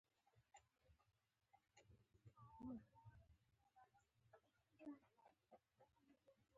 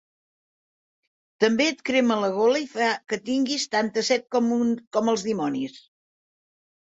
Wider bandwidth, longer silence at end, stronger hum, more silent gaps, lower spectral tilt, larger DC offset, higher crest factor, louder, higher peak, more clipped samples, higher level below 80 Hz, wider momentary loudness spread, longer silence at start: second, 7.2 kHz vs 8 kHz; second, 0 s vs 1.05 s; neither; second, none vs 4.87-4.91 s; first, -7 dB/octave vs -3.5 dB/octave; neither; about the same, 20 dB vs 18 dB; second, -61 LUFS vs -24 LUFS; second, -46 dBFS vs -6 dBFS; neither; second, -84 dBFS vs -70 dBFS; first, 9 LU vs 5 LU; second, 0.15 s vs 1.4 s